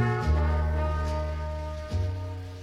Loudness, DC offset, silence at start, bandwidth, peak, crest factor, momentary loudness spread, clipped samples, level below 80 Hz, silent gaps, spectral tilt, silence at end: -29 LUFS; under 0.1%; 0 s; 7.6 kHz; -14 dBFS; 14 dB; 9 LU; under 0.1%; -30 dBFS; none; -7.5 dB/octave; 0 s